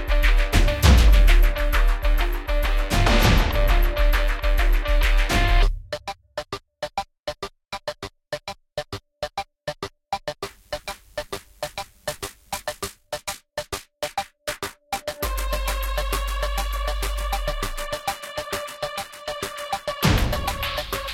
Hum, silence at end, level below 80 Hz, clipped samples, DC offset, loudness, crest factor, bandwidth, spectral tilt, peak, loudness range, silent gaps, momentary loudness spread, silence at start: none; 0 s; -22 dBFS; under 0.1%; under 0.1%; -25 LUFS; 18 dB; 16 kHz; -4.5 dB/octave; -2 dBFS; 12 LU; none; 14 LU; 0 s